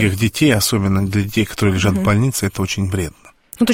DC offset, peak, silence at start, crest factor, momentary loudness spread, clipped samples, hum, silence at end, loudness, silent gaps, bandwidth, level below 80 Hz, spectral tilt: under 0.1%; -2 dBFS; 0 s; 14 dB; 6 LU; under 0.1%; none; 0 s; -17 LUFS; none; 16.5 kHz; -40 dBFS; -5 dB/octave